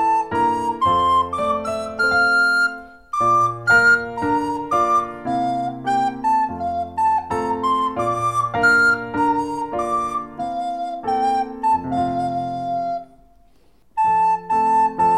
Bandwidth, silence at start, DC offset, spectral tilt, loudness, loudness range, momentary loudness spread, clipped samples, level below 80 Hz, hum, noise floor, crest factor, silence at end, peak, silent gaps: 13.5 kHz; 0 s; 0.2%; -5 dB/octave; -19 LUFS; 5 LU; 10 LU; under 0.1%; -50 dBFS; none; -57 dBFS; 14 dB; 0 s; -4 dBFS; none